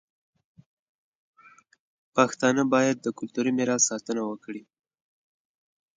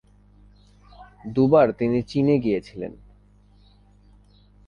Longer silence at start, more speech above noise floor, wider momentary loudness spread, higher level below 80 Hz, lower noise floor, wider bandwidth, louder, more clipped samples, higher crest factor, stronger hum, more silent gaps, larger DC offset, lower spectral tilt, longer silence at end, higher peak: first, 2.15 s vs 1 s; about the same, 32 dB vs 34 dB; second, 13 LU vs 19 LU; second, -76 dBFS vs -52 dBFS; about the same, -57 dBFS vs -54 dBFS; first, 9.6 kHz vs 7 kHz; second, -25 LUFS vs -21 LUFS; neither; about the same, 22 dB vs 20 dB; second, none vs 50 Hz at -50 dBFS; neither; neither; second, -3.5 dB/octave vs -9 dB/octave; second, 1.35 s vs 1.75 s; about the same, -6 dBFS vs -4 dBFS